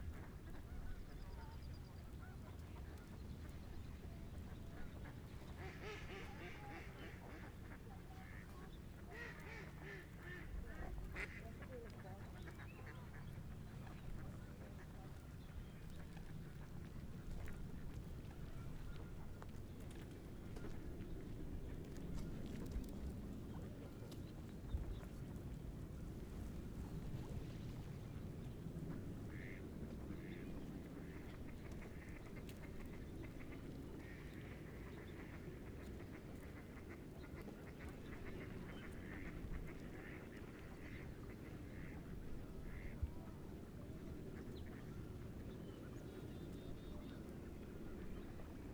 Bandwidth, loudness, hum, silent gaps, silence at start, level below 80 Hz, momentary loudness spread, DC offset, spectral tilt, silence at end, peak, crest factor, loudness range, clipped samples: over 20 kHz; -53 LUFS; none; none; 0 s; -56 dBFS; 5 LU; under 0.1%; -6.5 dB/octave; 0 s; -32 dBFS; 20 dB; 3 LU; under 0.1%